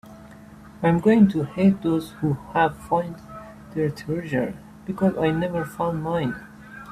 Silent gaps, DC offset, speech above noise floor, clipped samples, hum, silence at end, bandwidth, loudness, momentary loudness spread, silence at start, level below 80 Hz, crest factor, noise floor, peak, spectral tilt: none; under 0.1%; 22 dB; under 0.1%; none; 0 s; 14 kHz; -23 LUFS; 19 LU; 0.05 s; -52 dBFS; 18 dB; -44 dBFS; -6 dBFS; -8 dB/octave